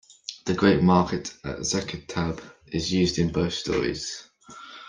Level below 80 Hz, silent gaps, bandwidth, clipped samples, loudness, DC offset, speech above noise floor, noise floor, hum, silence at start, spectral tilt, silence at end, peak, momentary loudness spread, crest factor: -48 dBFS; none; 10 kHz; under 0.1%; -25 LUFS; under 0.1%; 21 dB; -45 dBFS; none; 0.3 s; -5 dB/octave; 0 s; -6 dBFS; 17 LU; 20 dB